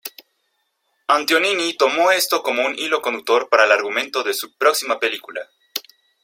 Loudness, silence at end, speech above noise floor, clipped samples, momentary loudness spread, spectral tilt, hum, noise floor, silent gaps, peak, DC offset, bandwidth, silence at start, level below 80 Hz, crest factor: -18 LUFS; 0.45 s; 51 dB; under 0.1%; 15 LU; -0.5 dB/octave; none; -70 dBFS; none; -2 dBFS; under 0.1%; 16.5 kHz; 0.05 s; -74 dBFS; 18 dB